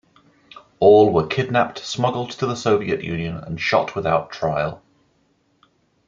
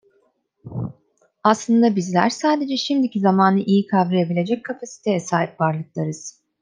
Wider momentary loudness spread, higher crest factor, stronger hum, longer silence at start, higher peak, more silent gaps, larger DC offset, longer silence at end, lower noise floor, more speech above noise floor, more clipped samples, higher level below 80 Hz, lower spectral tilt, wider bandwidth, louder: second, 11 LU vs 14 LU; about the same, 18 dB vs 18 dB; neither; about the same, 0.55 s vs 0.65 s; about the same, -2 dBFS vs -2 dBFS; neither; neither; first, 1.3 s vs 0.3 s; about the same, -63 dBFS vs -64 dBFS; about the same, 44 dB vs 45 dB; neither; first, -54 dBFS vs -62 dBFS; about the same, -6 dB/octave vs -6 dB/octave; second, 7.6 kHz vs 9.6 kHz; about the same, -20 LUFS vs -20 LUFS